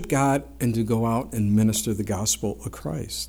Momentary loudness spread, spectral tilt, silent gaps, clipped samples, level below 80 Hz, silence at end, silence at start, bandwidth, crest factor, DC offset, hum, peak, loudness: 10 LU; -5 dB/octave; none; under 0.1%; -44 dBFS; 0 s; 0 s; 19 kHz; 14 dB; under 0.1%; none; -10 dBFS; -24 LUFS